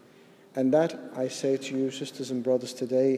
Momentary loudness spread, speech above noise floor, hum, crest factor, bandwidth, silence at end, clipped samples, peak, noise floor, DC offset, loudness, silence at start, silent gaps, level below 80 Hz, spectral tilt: 9 LU; 28 dB; none; 18 dB; 14 kHz; 0 s; under 0.1%; -10 dBFS; -55 dBFS; under 0.1%; -28 LUFS; 0.55 s; none; -80 dBFS; -5.5 dB/octave